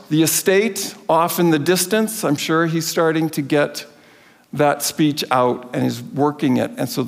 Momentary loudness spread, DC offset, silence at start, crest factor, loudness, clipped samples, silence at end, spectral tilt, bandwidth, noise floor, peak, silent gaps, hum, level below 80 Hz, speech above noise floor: 7 LU; under 0.1%; 0.1 s; 16 dB; -18 LUFS; under 0.1%; 0 s; -4.5 dB/octave; 16.5 kHz; -49 dBFS; -4 dBFS; none; none; -68 dBFS; 31 dB